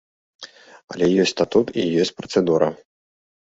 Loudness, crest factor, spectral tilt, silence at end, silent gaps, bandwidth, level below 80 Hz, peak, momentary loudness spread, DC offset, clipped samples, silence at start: -20 LUFS; 20 dB; -5.5 dB/octave; 0.85 s; 0.84-0.88 s; 8 kHz; -58 dBFS; -2 dBFS; 22 LU; under 0.1%; under 0.1%; 0.4 s